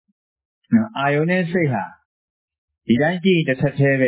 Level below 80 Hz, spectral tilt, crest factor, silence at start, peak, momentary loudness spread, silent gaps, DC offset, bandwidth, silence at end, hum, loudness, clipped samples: -58 dBFS; -11 dB/octave; 14 dB; 0.7 s; -6 dBFS; 7 LU; 2.05-2.48 s, 2.58-2.68 s; under 0.1%; 4 kHz; 0 s; none; -19 LUFS; under 0.1%